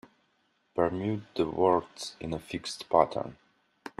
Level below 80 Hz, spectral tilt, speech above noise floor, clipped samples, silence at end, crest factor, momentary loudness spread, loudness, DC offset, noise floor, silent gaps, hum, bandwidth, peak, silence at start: -62 dBFS; -5.5 dB/octave; 43 dB; under 0.1%; 0.1 s; 24 dB; 15 LU; -30 LUFS; under 0.1%; -72 dBFS; none; none; 13.5 kHz; -6 dBFS; 0.75 s